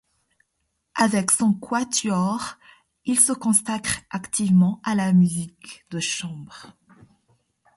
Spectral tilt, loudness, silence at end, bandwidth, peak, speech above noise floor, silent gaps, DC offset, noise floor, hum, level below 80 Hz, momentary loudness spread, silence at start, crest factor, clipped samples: -4 dB/octave; -21 LUFS; 1.05 s; 12 kHz; -2 dBFS; 53 dB; none; under 0.1%; -75 dBFS; none; -60 dBFS; 16 LU; 0.95 s; 22 dB; under 0.1%